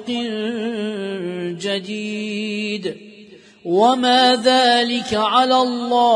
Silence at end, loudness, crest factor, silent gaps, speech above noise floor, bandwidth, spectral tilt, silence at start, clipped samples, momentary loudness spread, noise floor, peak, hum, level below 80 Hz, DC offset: 0 s; -18 LUFS; 16 dB; none; 27 dB; 10.5 kHz; -4 dB/octave; 0 s; under 0.1%; 12 LU; -44 dBFS; -2 dBFS; none; -62 dBFS; under 0.1%